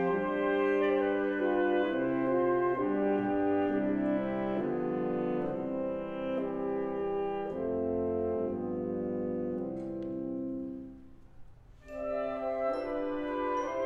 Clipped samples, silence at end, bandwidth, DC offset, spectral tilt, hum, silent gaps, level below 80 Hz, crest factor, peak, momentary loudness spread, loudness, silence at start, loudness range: under 0.1%; 0 s; 6.2 kHz; under 0.1%; -8 dB/octave; none; none; -58 dBFS; 14 dB; -18 dBFS; 8 LU; -32 LUFS; 0 s; 8 LU